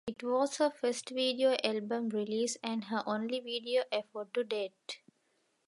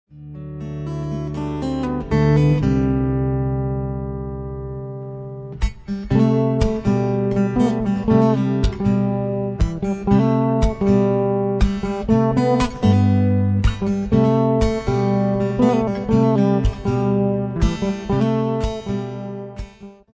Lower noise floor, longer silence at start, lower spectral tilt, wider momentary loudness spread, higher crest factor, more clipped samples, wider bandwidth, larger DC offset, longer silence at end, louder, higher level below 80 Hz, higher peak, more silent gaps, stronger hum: first, -76 dBFS vs -39 dBFS; about the same, 0.05 s vs 0.15 s; second, -3.5 dB/octave vs -8.5 dB/octave; second, 8 LU vs 13 LU; about the same, 20 dB vs 16 dB; neither; first, 11.5 kHz vs 8 kHz; neither; first, 0.7 s vs 0.25 s; second, -34 LUFS vs -19 LUFS; second, -80 dBFS vs -30 dBFS; second, -14 dBFS vs -2 dBFS; neither; neither